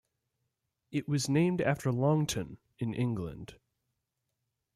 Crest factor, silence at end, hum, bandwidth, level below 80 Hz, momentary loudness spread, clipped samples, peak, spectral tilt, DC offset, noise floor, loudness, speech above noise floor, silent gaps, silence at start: 18 dB; 1.2 s; none; 15 kHz; -62 dBFS; 15 LU; under 0.1%; -16 dBFS; -6 dB/octave; under 0.1%; -84 dBFS; -31 LUFS; 53 dB; none; 0.9 s